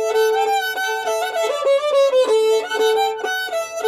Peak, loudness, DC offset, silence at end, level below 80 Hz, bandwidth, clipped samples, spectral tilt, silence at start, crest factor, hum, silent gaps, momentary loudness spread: -6 dBFS; -18 LUFS; under 0.1%; 0 s; -72 dBFS; 15.5 kHz; under 0.1%; 0.5 dB/octave; 0 s; 12 dB; none; none; 6 LU